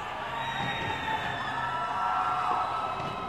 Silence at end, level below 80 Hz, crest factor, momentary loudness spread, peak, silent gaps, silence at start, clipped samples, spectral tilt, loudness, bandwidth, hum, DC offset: 0 s; -56 dBFS; 16 dB; 5 LU; -14 dBFS; none; 0 s; under 0.1%; -4.5 dB/octave; -30 LUFS; 15.5 kHz; none; 0.1%